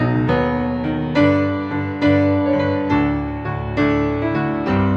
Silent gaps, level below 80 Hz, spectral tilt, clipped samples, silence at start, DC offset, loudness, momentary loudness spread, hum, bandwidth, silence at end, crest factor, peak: none; -36 dBFS; -9 dB/octave; under 0.1%; 0 s; under 0.1%; -19 LUFS; 7 LU; none; 6.6 kHz; 0 s; 16 dB; -2 dBFS